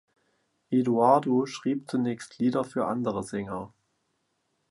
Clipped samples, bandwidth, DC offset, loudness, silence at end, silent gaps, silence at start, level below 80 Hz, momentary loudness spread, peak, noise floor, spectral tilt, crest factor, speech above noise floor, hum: under 0.1%; 11.5 kHz; under 0.1%; -27 LUFS; 1.05 s; none; 0.7 s; -66 dBFS; 12 LU; -8 dBFS; -76 dBFS; -7 dB/octave; 20 dB; 49 dB; none